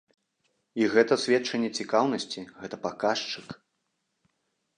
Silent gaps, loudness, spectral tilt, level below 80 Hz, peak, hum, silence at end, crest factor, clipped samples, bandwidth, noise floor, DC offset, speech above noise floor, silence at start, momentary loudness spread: none; -27 LUFS; -4 dB/octave; -72 dBFS; -8 dBFS; none; 1.2 s; 20 dB; under 0.1%; 10 kHz; -78 dBFS; under 0.1%; 51 dB; 0.75 s; 16 LU